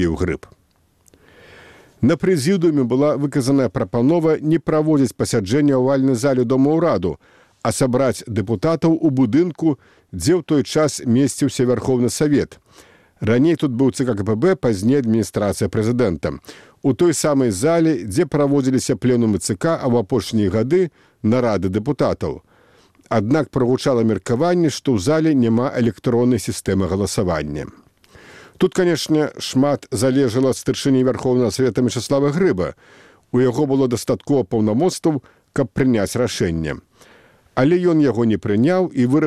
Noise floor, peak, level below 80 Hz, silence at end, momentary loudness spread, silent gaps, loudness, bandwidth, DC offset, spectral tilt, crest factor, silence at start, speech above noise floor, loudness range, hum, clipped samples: -59 dBFS; -2 dBFS; -46 dBFS; 0 s; 7 LU; none; -18 LUFS; 15 kHz; 0.2%; -6.5 dB/octave; 16 dB; 0 s; 42 dB; 3 LU; none; under 0.1%